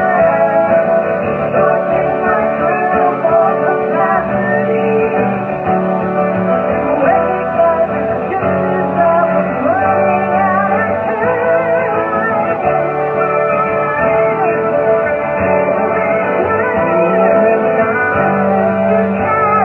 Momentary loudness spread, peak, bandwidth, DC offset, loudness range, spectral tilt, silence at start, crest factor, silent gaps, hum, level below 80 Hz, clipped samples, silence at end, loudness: 3 LU; -2 dBFS; 4 kHz; under 0.1%; 1 LU; -9.5 dB/octave; 0 s; 12 dB; none; none; -44 dBFS; under 0.1%; 0 s; -13 LUFS